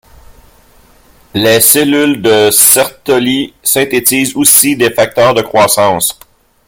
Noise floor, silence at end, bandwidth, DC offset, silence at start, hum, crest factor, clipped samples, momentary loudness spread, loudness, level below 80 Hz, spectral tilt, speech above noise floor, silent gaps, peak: -44 dBFS; 0.55 s; over 20 kHz; under 0.1%; 1.35 s; none; 10 dB; 0.7%; 8 LU; -8 LUFS; -46 dBFS; -2.5 dB/octave; 35 dB; none; 0 dBFS